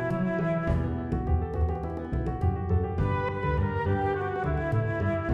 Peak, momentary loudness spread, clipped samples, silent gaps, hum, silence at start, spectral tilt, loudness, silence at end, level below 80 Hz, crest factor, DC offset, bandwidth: -14 dBFS; 3 LU; under 0.1%; none; none; 0 s; -9.5 dB/octave; -29 LUFS; 0 s; -36 dBFS; 14 dB; under 0.1%; 5.6 kHz